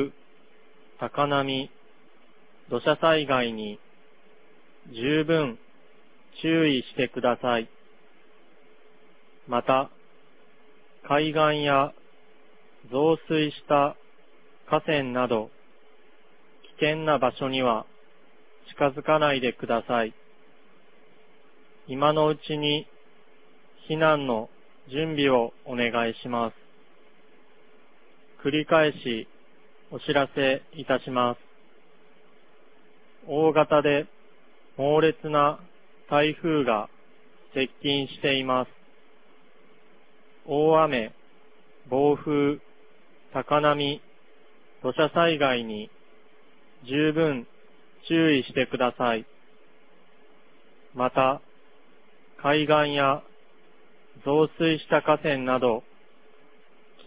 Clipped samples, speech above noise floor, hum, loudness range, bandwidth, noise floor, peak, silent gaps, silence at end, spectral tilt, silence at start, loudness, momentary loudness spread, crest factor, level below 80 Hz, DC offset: under 0.1%; 35 dB; none; 4 LU; 4 kHz; -59 dBFS; -6 dBFS; none; 1.25 s; -9.5 dB/octave; 0 s; -25 LUFS; 13 LU; 22 dB; -64 dBFS; 0.4%